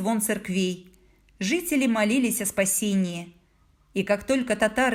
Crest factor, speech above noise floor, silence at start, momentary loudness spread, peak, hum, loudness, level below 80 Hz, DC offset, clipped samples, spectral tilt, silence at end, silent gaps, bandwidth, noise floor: 16 dB; 37 dB; 0 s; 10 LU; -8 dBFS; none; -25 LUFS; -58 dBFS; under 0.1%; under 0.1%; -4 dB/octave; 0 s; none; 18 kHz; -61 dBFS